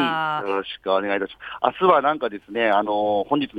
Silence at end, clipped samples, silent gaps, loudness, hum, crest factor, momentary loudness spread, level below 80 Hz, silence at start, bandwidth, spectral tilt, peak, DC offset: 0 s; under 0.1%; none; -22 LUFS; none; 20 dB; 9 LU; -62 dBFS; 0 s; 8.4 kHz; -7 dB/octave; -2 dBFS; under 0.1%